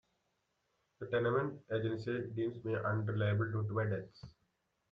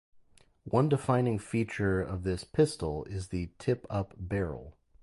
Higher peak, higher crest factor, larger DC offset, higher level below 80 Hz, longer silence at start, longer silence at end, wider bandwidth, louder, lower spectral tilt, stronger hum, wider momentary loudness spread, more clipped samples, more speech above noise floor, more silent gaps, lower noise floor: second, -20 dBFS vs -12 dBFS; about the same, 16 dB vs 18 dB; neither; second, -70 dBFS vs -48 dBFS; first, 1 s vs 0.65 s; first, 0.6 s vs 0.3 s; second, 5.2 kHz vs 11.5 kHz; second, -37 LUFS vs -31 LUFS; first, -9 dB/octave vs -7 dB/octave; neither; second, 7 LU vs 10 LU; neither; first, 45 dB vs 31 dB; neither; first, -81 dBFS vs -61 dBFS